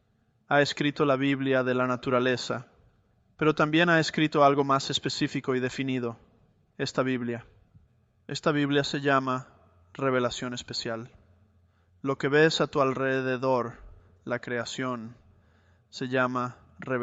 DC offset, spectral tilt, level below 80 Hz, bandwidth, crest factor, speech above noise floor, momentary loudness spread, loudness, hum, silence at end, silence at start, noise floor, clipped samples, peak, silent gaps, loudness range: under 0.1%; -5 dB/octave; -62 dBFS; 8.2 kHz; 20 dB; 41 dB; 14 LU; -27 LUFS; none; 0 s; 0.5 s; -67 dBFS; under 0.1%; -8 dBFS; none; 7 LU